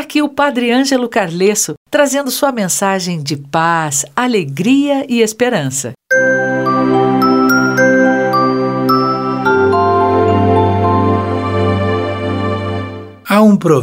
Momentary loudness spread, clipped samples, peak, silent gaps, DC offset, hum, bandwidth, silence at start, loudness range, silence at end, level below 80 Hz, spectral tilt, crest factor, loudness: 7 LU; under 0.1%; 0 dBFS; 1.77-1.86 s; under 0.1%; none; 16.5 kHz; 0 s; 3 LU; 0 s; -54 dBFS; -5 dB/octave; 12 dB; -13 LUFS